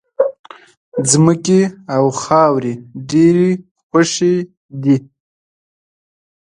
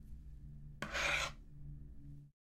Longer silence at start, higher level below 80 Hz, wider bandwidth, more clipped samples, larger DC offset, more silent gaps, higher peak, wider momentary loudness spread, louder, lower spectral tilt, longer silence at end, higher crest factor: first, 0.2 s vs 0 s; about the same, -58 dBFS vs -54 dBFS; second, 11.5 kHz vs 16 kHz; neither; neither; first, 0.39-0.44 s, 0.77-0.92 s, 3.71-3.75 s, 3.83-3.90 s, 4.57-4.69 s vs none; first, 0 dBFS vs -24 dBFS; second, 11 LU vs 21 LU; first, -15 LUFS vs -38 LUFS; first, -5.5 dB/octave vs -2.5 dB/octave; first, 1.55 s vs 0.2 s; about the same, 16 dB vs 20 dB